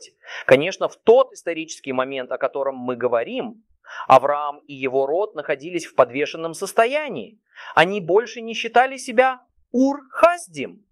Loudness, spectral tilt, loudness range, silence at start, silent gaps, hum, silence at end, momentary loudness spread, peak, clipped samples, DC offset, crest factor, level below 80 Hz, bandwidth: -20 LUFS; -4.5 dB/octave; 3 LU; 0 s; none; none; 0.2 s; 14 LU; 0 dBFS; under 0.1%; under 0.1%; 20 dB; -66 dBFS; 14 kHz